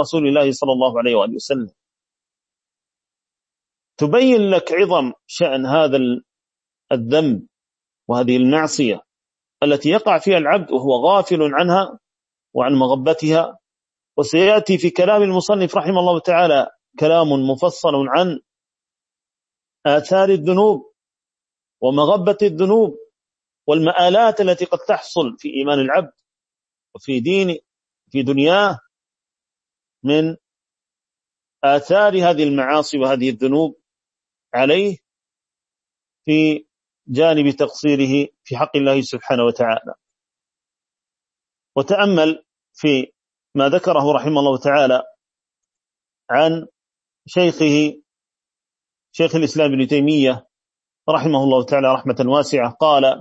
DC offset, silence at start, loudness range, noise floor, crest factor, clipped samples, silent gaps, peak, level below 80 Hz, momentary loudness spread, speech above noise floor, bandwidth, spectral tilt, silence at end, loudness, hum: under 0.1%; 0 s; 4 LU; under -90 dBFS; 16 dB; under 0.1%; none; -2 dBFS; -66 dBFS; 10 LU; over 74 dB; 8.2 kHz; -5.5 dB/octave; 0 s; -17 LUFS; none